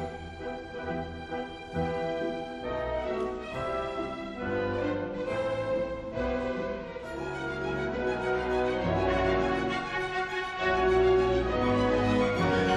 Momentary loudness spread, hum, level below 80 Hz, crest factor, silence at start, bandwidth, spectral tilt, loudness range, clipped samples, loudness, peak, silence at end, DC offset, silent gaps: 11 LU; none; -44 dBFS; 16 dB; 0 s; 10.5 kHz; -6.5 dB/octave; 6 LU; under 0.1%; -30 LUFS; -14 dBFS; 0 s; under 0.1%; none